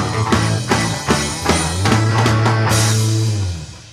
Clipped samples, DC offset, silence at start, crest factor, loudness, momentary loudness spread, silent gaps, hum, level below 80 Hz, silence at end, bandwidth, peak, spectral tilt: under 0.1%; under 0.1%; 0 s; 16 dB; -16 LUFS; 4 LU; none; none; -34 dBFS; 0 s; 15 kHz; -2 dBFS; -4.5 dB/octave